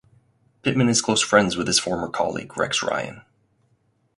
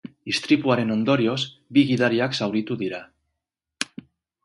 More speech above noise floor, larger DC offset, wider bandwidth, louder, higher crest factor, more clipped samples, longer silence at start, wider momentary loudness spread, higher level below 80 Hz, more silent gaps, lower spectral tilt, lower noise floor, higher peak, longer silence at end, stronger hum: second, 44 dB vs 61 dB; neither; about the same, 11.5 kHz vs 11.5 kHz; about the same, -21 LUFS vs -23 LUFS; about the same, 22 dB vs 20 dB; neither; first, 0.65 s vs 0.05 s; about the same, 9 LU vs 11 LU; first, -54 dBFS vs -64 dBFS; neither; second, -3.5 dB/octave vs -5.5 dB/octave; second, -66 dBFS vs -83 dBFS; about the same, -2 dBFS vs -4 dBFS; first, 0.95 s vs 0.6 s; neither